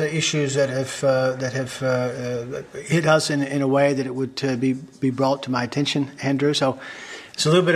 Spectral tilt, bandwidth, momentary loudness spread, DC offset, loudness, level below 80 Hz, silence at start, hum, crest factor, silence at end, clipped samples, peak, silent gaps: -5 dB/octave; 14 kHz; 9 LU; under 0.1%; -22 LUFS; -60 dBFS; 0 s; none; 20 dB; 0 s; under 0.1%; -2 dBFS; none